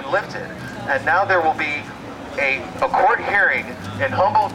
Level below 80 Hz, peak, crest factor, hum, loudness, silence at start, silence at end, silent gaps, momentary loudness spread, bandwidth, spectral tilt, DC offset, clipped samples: -52 dBFS; -6 dBFS; 14 dB; none; -19 LUFS; 0 s; 0 s; none; 13 LU; 15.5 kHz; -5 dB/octave; under 0.1%; under 0.1%